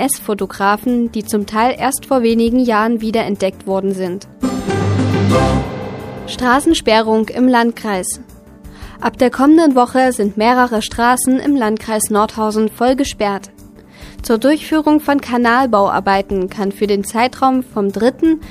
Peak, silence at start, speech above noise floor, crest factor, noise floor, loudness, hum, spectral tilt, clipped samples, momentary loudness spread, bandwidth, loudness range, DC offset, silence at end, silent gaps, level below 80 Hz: 0 dBFS; 0 s; 24 dB; 14 dB; -38 dBFS; -15 LUFS; none; -5 dB/octave; under 0.1%; 8 LU; 15.5 kHz; 3 LU; under 0.1%; 0 s; none; -38 dBFS